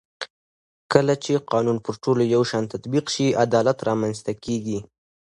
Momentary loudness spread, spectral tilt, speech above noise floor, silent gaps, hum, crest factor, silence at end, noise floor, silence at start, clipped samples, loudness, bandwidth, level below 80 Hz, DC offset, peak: 11 LU; -5.5 dB/octave; over 68 dB; 0.30-0.90 s; none; 22 dB; 0.5 s; under -90 dBFS; 0.2 s; under 0.1%; -22 LUFS; 11.5 kHz; -58 dBFS; under 0.1%; 0 dBFS